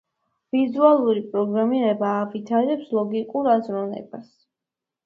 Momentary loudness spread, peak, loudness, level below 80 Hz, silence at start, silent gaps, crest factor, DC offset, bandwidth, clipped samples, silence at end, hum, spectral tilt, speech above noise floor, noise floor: 12 LU; -4 dBFS; -22 LUFS; -72 dBFS; 0.55 s; none; 20 dB; under 0.1%; 6.2 kHz; under 0.1%; 0.8 s; none; -8.5 dB/octave; 66 dB; -87 dBFS